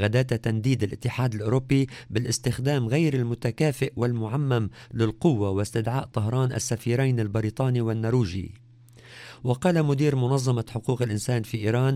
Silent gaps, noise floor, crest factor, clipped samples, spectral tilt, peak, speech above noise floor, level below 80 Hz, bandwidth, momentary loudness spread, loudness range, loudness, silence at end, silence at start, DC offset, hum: none; -51 dBFS; 18 dB; under 0.1%; -6.5 dB/octave; -8 dBFS; 26 dB; -52 dBFS; 14.5 kHz; 5 LU; 1 LU; -25 LUFS; 0 s; 0 s; under 0.1%; none